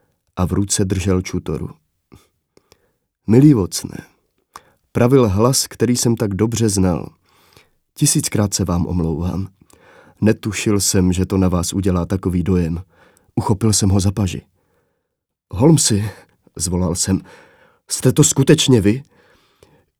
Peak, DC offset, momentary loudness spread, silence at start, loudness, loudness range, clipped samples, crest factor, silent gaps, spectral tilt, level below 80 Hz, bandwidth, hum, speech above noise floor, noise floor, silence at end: 0 dBFS; under 0.1%; 14 LU; 0.35 s; -17 LUFS; 3 LU; under 0.1%; 18 dB; none; -5 dB/octave; -40 dBFS; 17.5 kHz; none; 61 dB; -77 dBFS; 0.95 s